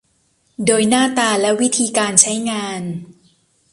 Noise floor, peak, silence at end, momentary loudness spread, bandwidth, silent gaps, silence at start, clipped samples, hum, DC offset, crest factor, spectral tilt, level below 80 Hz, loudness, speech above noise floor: -62 dBFS; 0 dBFS; 0.6 s; 13 LU; 13.5 kHz; none; 0.6 s; under 0.1%; none; under 0.1%; 18 dB; -2.5 dB/octave; -60 dBFS; -15 LUFS; 45 dB